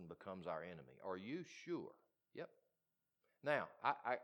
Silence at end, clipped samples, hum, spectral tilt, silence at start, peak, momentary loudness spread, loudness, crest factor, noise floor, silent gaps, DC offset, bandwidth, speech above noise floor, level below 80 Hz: 0 s; under 0.1%; none; -5.5 dB/octave; 0 s; -24 dBFS; 14 LU; -47 LUFS; 24 dB; under -90 dBFS; none; under 0.1%; 19 kHz; over 44 dB; -88 dBFS